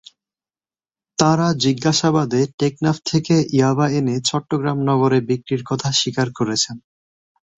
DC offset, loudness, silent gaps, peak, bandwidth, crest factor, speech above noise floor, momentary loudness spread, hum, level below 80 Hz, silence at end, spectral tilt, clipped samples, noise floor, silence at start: under 0.1%; -19 LUFS; 2.54-2.58 s; -2 dBFS; 8.4 kHz; 18 dB; over 72 dB; 6 LU; none; -56 dBFS; 0.8 s; -5 dB/octave; under 0.1%; under -90 dBFS; 1.2 s